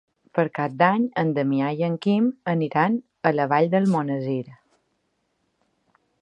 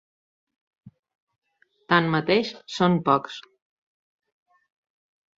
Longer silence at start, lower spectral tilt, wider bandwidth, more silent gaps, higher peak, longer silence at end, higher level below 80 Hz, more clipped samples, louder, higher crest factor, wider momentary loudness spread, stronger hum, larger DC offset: second, 0.35 s vs 0.85 s; first, -8.5 dB/octave vs -6 dB/octave; first, 9.8 kHz vs 7.8 kHz; second, none vs 0.99-1.03 s, 1.15-1.27 s, 1.38-1.42 s; about the same, -2 dBFS vs -4 dBFS; second, 1.65 s vs 2 s; second, -72 dBFS vs -66 dBFS; neither; about the same, -23 LUFS vs -22 LUFS; about the same, 22 dB vs 24 dB; second, 6 LU vs 13 LU; neither; neither